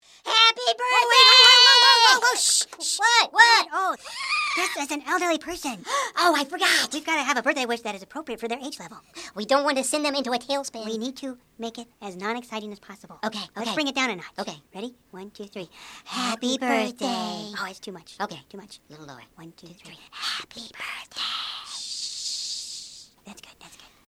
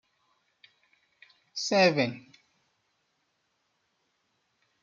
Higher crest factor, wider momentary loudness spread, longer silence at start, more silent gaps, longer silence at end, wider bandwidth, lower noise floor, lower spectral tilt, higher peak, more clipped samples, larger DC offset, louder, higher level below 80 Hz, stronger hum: about the same, 24 dB vs 24 dB; first, 23 LU vs 18 LU; second, 0.25 s vs 1.55 s; neither; second, 0.4 s vs 2.65 s; first, 16.5 kHz vs 7.6 kHz; second, -45 dBFS vs -76 dBFS; second, -0.5 dB/octave vs -4 dB/octave; first, 0 dBFS vs -10 dBFS; neither; neither; first, -20 LUFS vs -26 LUFS; first, -68 dBFS vs -80 dBFS; neither